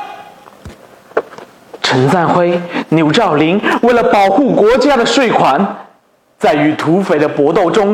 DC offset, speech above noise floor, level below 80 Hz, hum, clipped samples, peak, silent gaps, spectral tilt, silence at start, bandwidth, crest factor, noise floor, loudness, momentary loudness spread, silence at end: under 0.1%; 41 dB; -46 dBFS; none; under 0.1%; 0 dBFS; none; -5.5 dB/octave; 0 s; 14.5 kHz; 12 dB; -51 dBFS; -12 LUFS; 9 LU; 0 s